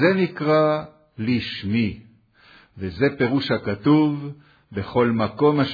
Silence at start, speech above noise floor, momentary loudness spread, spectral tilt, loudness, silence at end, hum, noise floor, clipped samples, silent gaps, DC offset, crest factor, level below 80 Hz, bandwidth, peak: 0 s; 32 dB; 15 LU; -9 dB/octave; -22 LUFS; 0 s; none; -53 dBFS; under 0.1%; none; under 0.1%; 18 dB; -54 dBFS; 5 kHz; -4 dBFS